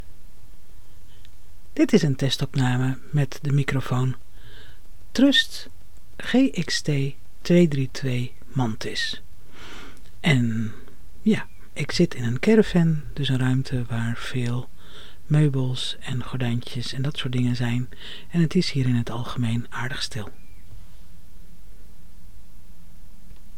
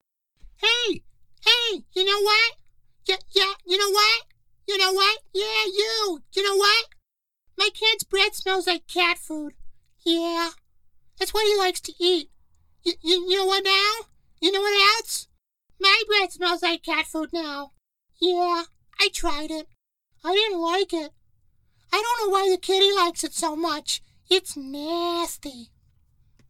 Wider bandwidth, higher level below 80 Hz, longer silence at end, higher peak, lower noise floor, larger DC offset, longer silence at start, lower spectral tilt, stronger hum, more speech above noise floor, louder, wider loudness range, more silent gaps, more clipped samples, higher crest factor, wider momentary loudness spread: about the same, 16 kHz vs 16.5 kHz; first, -46 dBFS vs -52 dBFS; second, 0 s vs 0.85 s; about the same, -4 dBFS vs -4 dBFS; second, -47 dBFS vs -72 dBFS; first, 4% vs under 0.1%; second, 0 s vs 0.6 s; first, -6 dB/octave vs -0.5 dB/octave; neither; second, 24 dB vs 49 dB; about the same, -24 LUFS vs -22 LUFS; about the same, 4 LU vs 5 LU; neither; neither; about the same, 20 dB vs 20 dB; first, 17 LU vs 13 LU